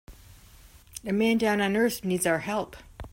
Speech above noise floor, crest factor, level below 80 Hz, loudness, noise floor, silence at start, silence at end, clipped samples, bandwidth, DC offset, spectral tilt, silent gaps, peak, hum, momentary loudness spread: 27 dB; 16 dB; -52 dBFS; -26 LUFS; -52 dBFS; 0.1 s; 0.05 s; under 0.1%; 16.5 kHz; under 0.1%; -4.5 dB/octave; none; -12 dBFS; none; 16 LU